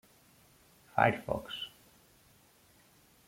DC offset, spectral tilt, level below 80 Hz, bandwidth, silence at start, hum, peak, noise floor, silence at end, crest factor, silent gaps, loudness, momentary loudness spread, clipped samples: under 0.1%; -5.5 dB/octave; -64 dBFS; 16.5 kHz; 0.95 s; none; -10 dBFS; -64 dBFS; 1.6 s; 28 dB; none; -33 LUFS; 13 LU; under 0.1%